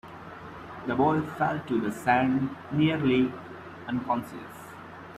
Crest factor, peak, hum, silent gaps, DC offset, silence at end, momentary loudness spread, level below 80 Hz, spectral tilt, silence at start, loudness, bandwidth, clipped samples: 20 dB; -8 dBFS; none; none; under 0.1%; 0 s; 19 LU; -60 dBFS; -7 dB/octave; 0.05 s; -27 LUFS; 14 kHz; under 0.1%